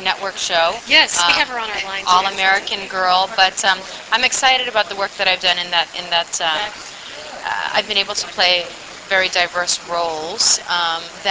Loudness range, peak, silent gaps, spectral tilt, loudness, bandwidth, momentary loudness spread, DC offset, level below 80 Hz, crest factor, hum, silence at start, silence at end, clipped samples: 4 LU; 0 dBFS; none; 0.5 dB/octave; -16 LUFS; 8 kHz; 9 LU; under 0.1%; -54 dBFS; 18 dB; none; 0 s; 0 s; under 0.1%